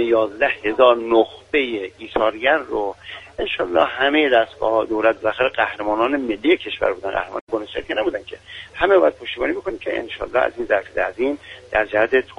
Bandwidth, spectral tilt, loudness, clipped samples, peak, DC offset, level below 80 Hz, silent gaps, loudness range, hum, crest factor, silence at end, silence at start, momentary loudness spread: 9.6 kHz; -5.5 dB/octave; -20 LUFS; under 0.1%; 0 dBFS; under 0.1%; -48 dBFS; 7.41-7.47 s; 3 LU; none; 20 dB; 0.05 s; 0 s; 10 LU